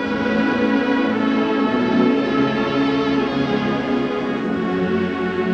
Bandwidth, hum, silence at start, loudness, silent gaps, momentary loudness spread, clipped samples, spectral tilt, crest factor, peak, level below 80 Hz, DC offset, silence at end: 7.2 kHz; none; 0 s; -19 LUFS; none; 4 LU; under 0.1%; -7 dB/octave; 14 dB; -6 dBFS; -50 dBFS; under 0.1%; 0 s